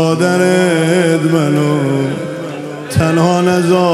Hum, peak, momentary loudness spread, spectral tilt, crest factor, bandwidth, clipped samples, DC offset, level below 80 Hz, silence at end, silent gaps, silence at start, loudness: none; 0 dBFS; 11 LU; -6 dB/octave; 12 dB; 15 kHz; under 0.1%; under 0.1%; -48 dBFS; 0 s; none; 0 s; -13 LUFS